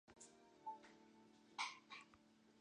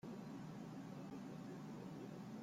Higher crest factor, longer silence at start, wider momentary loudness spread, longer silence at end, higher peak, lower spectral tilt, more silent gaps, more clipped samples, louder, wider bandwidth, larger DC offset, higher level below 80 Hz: first, 24 dB vs 10 dB; about the same, 0.05 s vs 0.05 s; first, 19 LU vs 0 LU; about the same, 0 s vs 0 s; first, -34 dBFS vs -42 dBFS; second, -0.5 dB/octave vs -7 dB/octave; neither; neither; about the same, -54 LUFS vs -52 LUFS; second, 9.6 kHz vs 16 kHz; neither; second, under -90 dBFS vs -80 dBFS